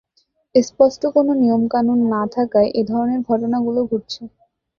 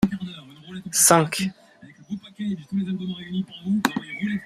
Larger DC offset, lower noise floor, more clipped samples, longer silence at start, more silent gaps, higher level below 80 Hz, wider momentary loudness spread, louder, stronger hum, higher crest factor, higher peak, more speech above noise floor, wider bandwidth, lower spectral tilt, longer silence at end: neither; first, -64 dBFS vs -49 dBFS; neither; first, 0.55 s vs 0 s; neither; about the same, -56 dBFS vs -56 dBFS; second, 6 LU vs 21 LU; first, -18 LUFS vs -23 LUFS; neither; about the same, 18 dB vs 22 dB; about the same, 0 dBFS vs -2 dBFS; first, 47 dB vs 26 dB; second, 7.2 kHz vs 15.5 kHz; first, -6.5 dB/octave vs -3.5 dB/octave; first, 0.5 s vs 0 s